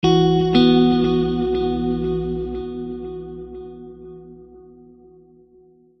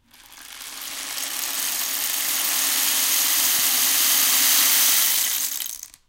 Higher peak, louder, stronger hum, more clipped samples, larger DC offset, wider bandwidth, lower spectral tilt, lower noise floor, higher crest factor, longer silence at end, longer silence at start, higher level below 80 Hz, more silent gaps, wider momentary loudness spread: about the same, -2 dBFS vs -4 dBFS; about the same, -19 LUFS vs -18 LUFS; neither; neither; neither; second, 6.2 kHz vs 17.5 kHz; first, -7.5 dB/octave vs 3 dB/octave; first, -52 dBFS vs -46 dBFS; about the same, 18 dB vs 18 dB; first, 1.4 s vs 0.2 s; second, 0.05 s vs 0.3 s; first, -38 dBFS vs -64 dBFS; neither; first, 24 LU vs 15 LU